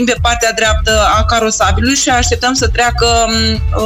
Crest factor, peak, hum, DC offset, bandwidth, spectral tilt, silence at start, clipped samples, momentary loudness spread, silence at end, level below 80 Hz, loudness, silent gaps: 10 dB; -2 dBFS; none; under 0.1%; 16 kHz; -3.5 dB/octave; 0 s; under 0.1%; 2 LU; 0 s; -20 dBFS; -11 LUFS; none